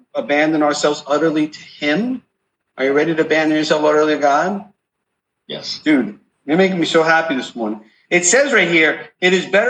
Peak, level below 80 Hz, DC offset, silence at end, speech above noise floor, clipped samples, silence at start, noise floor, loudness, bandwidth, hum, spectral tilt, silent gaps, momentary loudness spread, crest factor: -2 dBFS; -68 dBFS; under 0.1%; 0 s; 59 dB; under 0.1%; 0.15 s; -75 dBFS; -16 LUFS; 9.4 kHz; none; -3.5 dB/octave; none; 13 LU; 16 dB